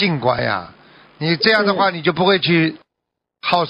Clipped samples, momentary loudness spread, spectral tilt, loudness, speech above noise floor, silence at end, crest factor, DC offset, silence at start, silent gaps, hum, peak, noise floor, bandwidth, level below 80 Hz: under 0.1%; 9 LU; -7.5 dB/octave; -17 LUFS; 63 dB; 0 s; 16 dB; under 0.1%; 0 s; none; none; -2 dBFS; -80 dBFS; 7 kHz; -56 dBFS